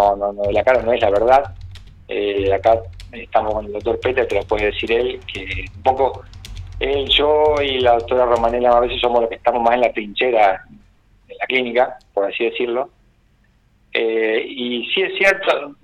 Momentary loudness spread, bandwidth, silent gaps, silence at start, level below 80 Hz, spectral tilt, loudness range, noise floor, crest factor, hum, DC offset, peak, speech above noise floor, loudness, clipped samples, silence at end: 11 LU; 10.5 kHz; none; 0 s; -40 dBFS; -5 dB/octave; 5 LU; -56 dBFS; 16 dB; none; under 0.1%; -2 dBFS; 39 dB; -18 LUFS; under 0.1%; 0.1 s